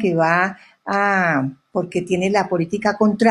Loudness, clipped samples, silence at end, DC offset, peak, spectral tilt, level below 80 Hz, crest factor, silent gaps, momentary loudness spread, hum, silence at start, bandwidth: -19 LUFS; under 0.1%; 0 s; under 0.1%; -2 dBFS; -6.5 dB/octave; -60 dBFS; 18 dB; none; 7 LU; none; 0 s; 11 kHz